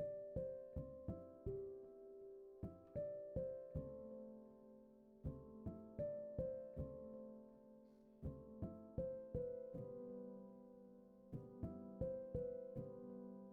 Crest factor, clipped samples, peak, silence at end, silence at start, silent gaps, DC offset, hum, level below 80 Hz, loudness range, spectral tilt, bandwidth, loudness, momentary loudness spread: 18 dB; under 0.1%; -32 dBFS; 0 s; 0 s; none; under 0.1%; none; -64 dBFS; 1 LU; -12 dB/octave; 3.2 kHz; -52 LUFS; 15 LU